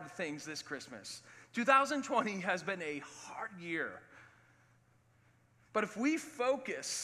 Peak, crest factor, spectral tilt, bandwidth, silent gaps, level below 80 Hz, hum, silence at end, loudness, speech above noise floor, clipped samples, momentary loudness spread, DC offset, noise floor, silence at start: -14 dBFS; 24 dB; -3.5 dB/octave; 14.5 kHz; none; -84 dBFS; none; 0 s; -36 LUFS; 33 dB; under 0.1%; 17 LU; under 0.1%; -69 dBFS; 0 s